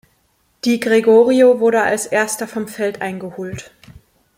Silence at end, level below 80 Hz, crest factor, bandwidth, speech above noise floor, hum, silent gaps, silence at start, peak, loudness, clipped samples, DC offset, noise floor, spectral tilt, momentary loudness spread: 0.75 s; -56 dBFS; 16 dB; 16.5 kHz; 46 dB; none; none; 0.65 s; -2 dBFS; -15 LUFS; under 0.1%; under 0.1%; -61 dBFS; -4.5 dB/octave; 16 LU